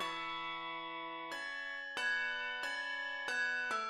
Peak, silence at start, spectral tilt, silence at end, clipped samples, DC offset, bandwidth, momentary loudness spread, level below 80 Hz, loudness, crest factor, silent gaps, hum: -26 dBFS; 0 s; -1 dB/octave; 0 s; under 0.1%; under 0.1%; 15.5 kHz; 8 LU; -76 dBFS; -38 LUFS; 14 dB; none; none